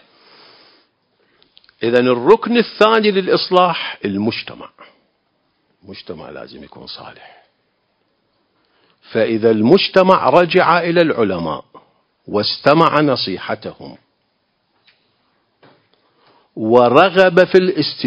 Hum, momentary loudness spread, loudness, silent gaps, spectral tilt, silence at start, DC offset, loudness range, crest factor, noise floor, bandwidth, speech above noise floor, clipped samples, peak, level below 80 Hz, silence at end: none; 22 LU; -14 LUFS; none; -7 dB/octave; 1.8 s; under 0.1%; 22 LU; 16 dB; -66 dBFS; 8 kHz; 51 dB; 0.2%; 0 dBFS; -56 dBFS; 0 s